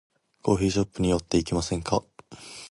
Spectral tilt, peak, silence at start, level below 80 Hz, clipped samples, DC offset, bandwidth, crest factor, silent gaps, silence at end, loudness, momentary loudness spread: -5.5 dB/octave; -8 dBFS; 0.45 s; -44 dBFS; under 0.1%; under 0.1%; 11.5 kHz; 20 dB; none; 0.05 s; -26 LUFS; 17 LU